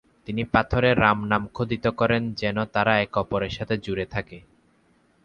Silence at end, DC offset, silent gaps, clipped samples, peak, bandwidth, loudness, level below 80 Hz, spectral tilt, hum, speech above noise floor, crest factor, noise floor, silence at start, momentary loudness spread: 0.85 s; under 0.1%; none; under 0.1%; -2 dBFS; 7.2 kHz; -24 LUFS; -44 dBFS; -7.5 dB/octave; none; 39 dB; 22 dB; -62 dBFS; 0.3 s; 10 LU